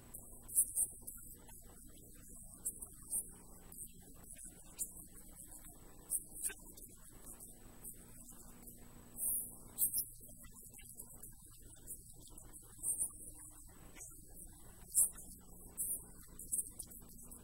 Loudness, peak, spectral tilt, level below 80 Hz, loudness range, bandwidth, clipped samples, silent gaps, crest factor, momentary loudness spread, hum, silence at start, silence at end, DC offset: -40 LUFS; -16 dBFS; -1.5 dB/octave; -60 dBFS; 7 LU; 16 kHz; under 0.1%; none; 28 dB; 21 LU; none; 0 s; 0 s; under 0.1%